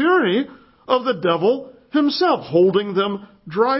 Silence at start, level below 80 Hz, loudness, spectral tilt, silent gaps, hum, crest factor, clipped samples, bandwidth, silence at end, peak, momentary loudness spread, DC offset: 0 s; -64 dBFS; -19 LUFS; -9.5 dB/octave; none; none; 16 dB; under 0.1%; 5.8 kHz; 0 s; -2 dBFS; 9 LU; under 0.1%